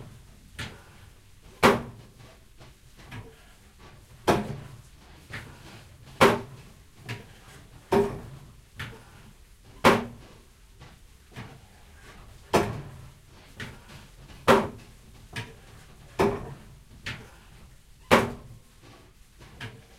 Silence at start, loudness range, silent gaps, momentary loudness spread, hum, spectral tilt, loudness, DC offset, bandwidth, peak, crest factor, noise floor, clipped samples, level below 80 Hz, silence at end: 0 s; 6 LU; none; 27 LU; none; -5 dB/octave; -26 LUFS; under 0.1%; 16 kHz; -2 dBFS; 30 dB; -53 dBFS; under 0.1%; -50 dBFS; 0.2 s